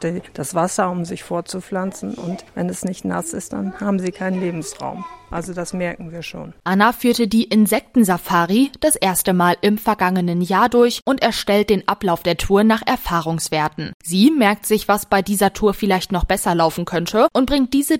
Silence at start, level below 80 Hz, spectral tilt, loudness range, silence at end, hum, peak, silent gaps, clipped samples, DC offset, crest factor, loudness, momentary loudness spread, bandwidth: 0 s; -40 dBFS; -4.5 dB/octave; 8 LU; 0 s; none; 0 dBFS; 13.94-14.00 s; under 0.1%; under 0.1%; 18 dB; -18 LUFS; 11 LU; 16.5 kHz